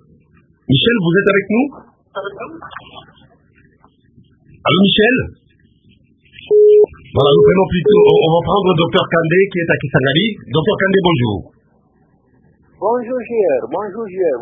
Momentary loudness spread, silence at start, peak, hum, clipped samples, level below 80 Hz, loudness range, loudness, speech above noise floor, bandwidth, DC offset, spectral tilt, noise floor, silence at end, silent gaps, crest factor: 18 LU; 0.7 s; 0 dBFS; none; under 0.1%; -44 dBFS; 8 LU; -13 LUFS; 41 dB; 3.8 kHz; under 0.1%; -9 dB/octave; -55 dBFS; 0 s; none; 16 dB